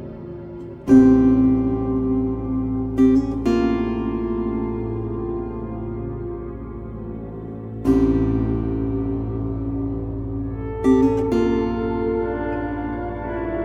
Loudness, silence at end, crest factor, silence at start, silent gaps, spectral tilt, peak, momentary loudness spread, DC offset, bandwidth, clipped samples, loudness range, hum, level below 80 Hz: -21 LUFS; 0 s; 18 dB; 0 s; none; -9 dB/octave; -2 dBFS; 16 LU; under 0.1%; 7.2 kHz; under 0.1%; 9 LU; none; -34 dBFS